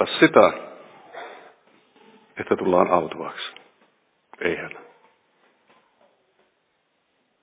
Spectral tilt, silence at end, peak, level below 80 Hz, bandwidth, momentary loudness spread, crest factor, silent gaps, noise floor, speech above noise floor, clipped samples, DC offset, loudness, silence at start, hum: -9.5 dB/octave; 2.6 s; 0 dBFS; -62 dBFS; 4 kHz; 25 LU; 24 dB; none; -70 dBFS; 50 dB; under 0.1%; under 0.1%; -21 LUFS; 0 s; none